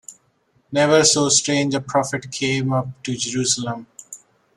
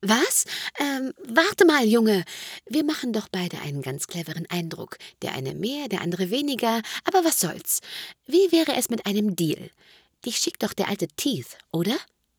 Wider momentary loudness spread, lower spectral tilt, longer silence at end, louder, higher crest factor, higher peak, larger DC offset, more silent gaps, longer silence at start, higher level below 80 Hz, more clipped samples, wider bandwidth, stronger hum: first, 20 LU vs 13 LU; about the same, -3 dB/octave vs -3.5 dB/octave; about the same, 0.4 s vs 0.35 s; first, -19 LUFS vs -24 LUFS; about the same, 18 dB vs 22 dB; about the same, -2 dBFS vs -4 dBFS; neither; neither; about the same, 0.1 s vs 0 s; first, -60 dBFS vs -70 dBFS; neither; second, 14 kHz vs over 20 kHz; neither